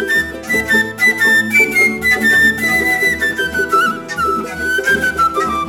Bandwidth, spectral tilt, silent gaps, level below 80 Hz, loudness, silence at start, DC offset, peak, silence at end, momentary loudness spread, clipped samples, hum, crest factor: 18 kHz; -3 dB/octave; none; -42 dBFS; -13 LUFS; 0 s; under 0.1%; -2 dBFS; 0 s; 7 LU; under 0.1%; none; 14 dB